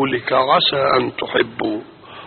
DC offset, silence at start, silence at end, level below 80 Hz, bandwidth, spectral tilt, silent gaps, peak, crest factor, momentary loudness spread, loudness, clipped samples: under 0.1%; 0 s; 0 s; -54 dBFS; 4.6 kHz; -1.5 dB/octave; none; -2 dBFS; 16 dB; 10 LU; -17 LUFS; under 0.1%